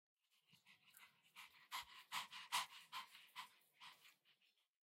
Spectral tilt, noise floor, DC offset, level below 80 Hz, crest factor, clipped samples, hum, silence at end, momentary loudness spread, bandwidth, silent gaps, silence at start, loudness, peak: 1.5 dB/octave; -81 dBFS; under 0.1%; under -90 dBFS; 26 dB; under 0.1%; none; 0.65 s; 22 LU; 16 kHz; none; 0.5 s; -51 LUFS; -30 dBFS